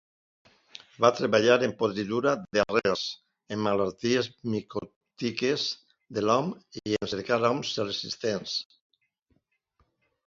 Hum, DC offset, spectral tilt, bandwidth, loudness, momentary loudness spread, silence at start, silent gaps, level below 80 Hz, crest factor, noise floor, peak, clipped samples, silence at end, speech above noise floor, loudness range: none; under 0.1%; -4.5 dB/octave; 7.6 kHz; -27 LUFS; 14 LU; 1 s; 4.96-5.01 s; -64 dBFS; 24 dB; -73 dBFS; -6 dBFS; under 0.1%; 1.65 s; 45 dB; 5 LU